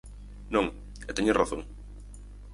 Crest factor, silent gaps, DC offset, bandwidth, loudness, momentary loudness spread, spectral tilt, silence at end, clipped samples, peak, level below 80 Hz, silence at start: 24 dB; none; under 0.1%; 11.5 kHz; -29 LUFS; 22 LU; -5 dB/octave; 0 s; under 0.1%; -8 dBFS; -44 dBFS; 0.05 s